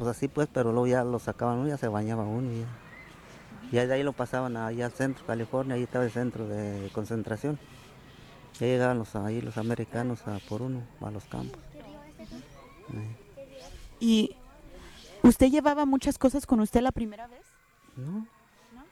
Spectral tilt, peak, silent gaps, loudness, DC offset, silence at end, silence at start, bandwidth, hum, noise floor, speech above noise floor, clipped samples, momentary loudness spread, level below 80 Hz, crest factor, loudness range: -6.5 dB/octave; -8 dBFS; none; -29 LUFS; under 0.1%; 0.05 s; 0 s; 14.5 kHz; none; -60 dBFS; 32 dB; under 0.1%; 23 LU; -50 dBFS; 22 dB; 10 LU